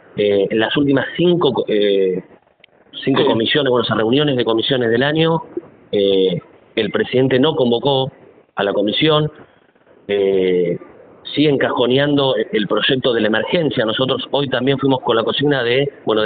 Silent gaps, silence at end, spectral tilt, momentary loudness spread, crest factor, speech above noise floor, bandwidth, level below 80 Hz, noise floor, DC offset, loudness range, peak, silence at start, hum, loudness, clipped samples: none; 0 s; -3.5 dB/octave; 7 LU; 14 dB; 36 dB; 4.7 kHz; -56 dBFS; -52 dBFS; under 0.1%; 2 LU; -2 dBFS; 0.15 s; none; -16 LUFS; under 0.1%